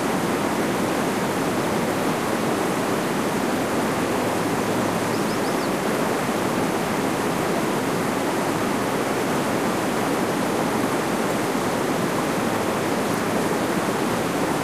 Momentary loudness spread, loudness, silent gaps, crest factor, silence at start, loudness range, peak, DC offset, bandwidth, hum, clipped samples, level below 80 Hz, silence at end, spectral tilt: 0 LU; -23 LUFS; none; 14 dB; 0 s; 0 LU; -10 dBFS; 0.2%; 15.5 kHz; none; under 0.1%; -52 dBFS; 0 s; -4.5 dB/octave